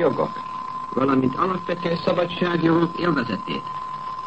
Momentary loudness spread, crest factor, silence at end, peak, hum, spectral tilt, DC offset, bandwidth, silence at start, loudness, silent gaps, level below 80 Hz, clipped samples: 11 LU; 16 dB; 0 s; -8 dBFS; none; -7.5 dB/octave; 0.4%; 8.4 kHz; 0 s; -23 LUFS; none; -56 dBFS; under 0.1%